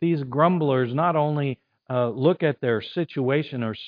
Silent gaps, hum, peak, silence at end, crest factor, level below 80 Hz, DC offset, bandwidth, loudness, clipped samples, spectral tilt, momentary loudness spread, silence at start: none; none; -4 dBFS; 0 s; 18 dB; -70 dBFS; under 0.1%; 5.2 kHz; -23 LUFS; under 0.1%; -10.5 dB/octave; 8 LU; 0 s